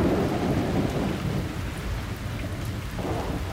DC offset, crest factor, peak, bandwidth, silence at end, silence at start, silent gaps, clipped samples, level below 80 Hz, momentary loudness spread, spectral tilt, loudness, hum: under 0.1%; 14 dB; -12 dBFS; 16 kHz; 0 s; 0 s; none; under 0.1%; -36 dBFS; 7 LU; -6.5 dB/octave; -29 LUFS; none